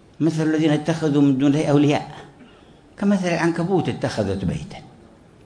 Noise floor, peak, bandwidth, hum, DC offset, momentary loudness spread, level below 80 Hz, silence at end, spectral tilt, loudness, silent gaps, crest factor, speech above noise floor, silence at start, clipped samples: -48 dBFS; -4 dBFS; 10.5 kHz; none; under 0.1%; 13 LU; -50 dBFS; 0.6 s; -7 dB/octave; -20 LUFS; none; 16 dB; 29 dB; 0.2 s; under 0.1%